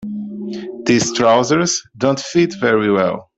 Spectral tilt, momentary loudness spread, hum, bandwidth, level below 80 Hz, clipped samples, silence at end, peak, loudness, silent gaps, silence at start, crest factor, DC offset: -4 dB/octave; 13 LU; none; 8.2 kHz; -56 dBFS; under 0.1%; 0.15 s; 0 dBFS; -16 LUFS; none; 0 s; 16 dB; under 0.1%